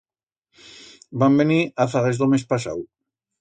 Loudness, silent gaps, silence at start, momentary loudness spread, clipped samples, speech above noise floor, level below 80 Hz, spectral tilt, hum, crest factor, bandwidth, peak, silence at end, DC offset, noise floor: -20 LUFS; none; 1.1 s; 16 LU; under 0.1%; 61 dB; -60 dBFS; -7 dB/octave; none; 18 dB; 9.2 kHz; -6 dBFS; 0.55 s; under 0.1%; -80 dBFS